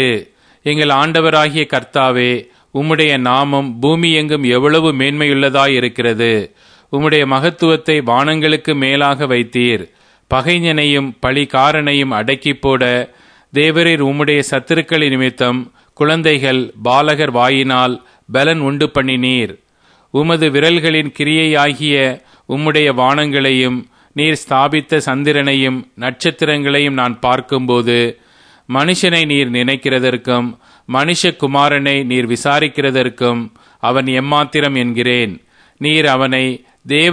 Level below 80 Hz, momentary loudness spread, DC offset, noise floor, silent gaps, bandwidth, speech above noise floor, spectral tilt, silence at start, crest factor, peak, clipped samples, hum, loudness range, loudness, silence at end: -48 dBFS; 7 LU; under 0.1%; -52 dBFS; none; 10.5 kHz; 39 dB; -5 dB/octave; 0 s; 14 dB; 0 dBFS; under 0.1%; none; 2 LU; -13 LUFS; 0 s